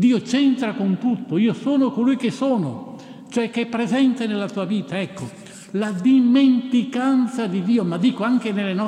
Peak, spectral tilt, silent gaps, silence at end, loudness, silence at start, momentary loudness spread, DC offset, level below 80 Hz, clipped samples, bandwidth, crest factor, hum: -8 dBFS; -6.5 dB/octave; none; 0 s; -20 LUFS; 0 s; 12 LU; under 0.1%; -70 dBFS; under 0.1%; 10 kHz; 12 dB; none